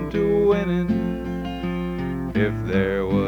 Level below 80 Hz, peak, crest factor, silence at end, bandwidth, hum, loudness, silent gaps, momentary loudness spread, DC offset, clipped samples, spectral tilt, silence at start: -38 dBFS; -6 dBFS; 16 dB; 0 s; 19 kHz; none; -23 LUFS; none; 8 LU; under 0.1%; under 0.1%; -8.5 dB/octave; 0 s